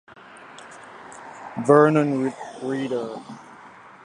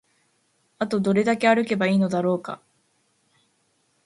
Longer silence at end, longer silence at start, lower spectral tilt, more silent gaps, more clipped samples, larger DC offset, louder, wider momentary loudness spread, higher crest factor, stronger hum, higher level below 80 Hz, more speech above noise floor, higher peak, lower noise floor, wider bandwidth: second, 0.35 s vs 1.5 s; second, 0.4 s vs 0.8 s; about the same, -7 dB/octave vs -6.5 dB/octave; neither; neither; neither; about the same, -21 LUFS vs -22 LUFS; first, 26 LU vs 11 LU; about the same, 22 dB vs 20 dB; neither; about the same, -70 dBFS vs -68 dBFS; second, 25 dB vs 47 dB; about the same, -2 dBFS vs -4 dBFS; second, -46 dBFS vs -68 dBFS; about the same, 10.5 kHz vs 11.5 kHz